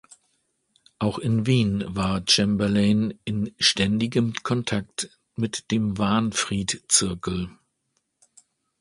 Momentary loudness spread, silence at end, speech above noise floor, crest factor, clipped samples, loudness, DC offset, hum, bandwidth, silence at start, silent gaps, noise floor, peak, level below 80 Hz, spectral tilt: 10 LU; 1.25 s; 51 dB; 22 dB; under 0.1%; -23 LUFS; under 0.1%; none; 11.5 kHz; 1 s; none; -74 dBFS; -4 dBFS; -50 dBFS; -4 dB/octave